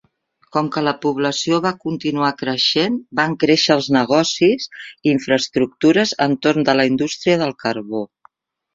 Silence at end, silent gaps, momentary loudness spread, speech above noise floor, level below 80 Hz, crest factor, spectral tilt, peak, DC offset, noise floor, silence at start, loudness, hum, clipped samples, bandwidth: 0.7 s; none; 8 LU; 44 dB; -58 dBFS; 16 dB; -4.5 dB/octave; -2 dBFS; under 0.1%; -61 dBFS; 0.55 s; -18 LUFS; none; under 0.1%; 7.8 kHz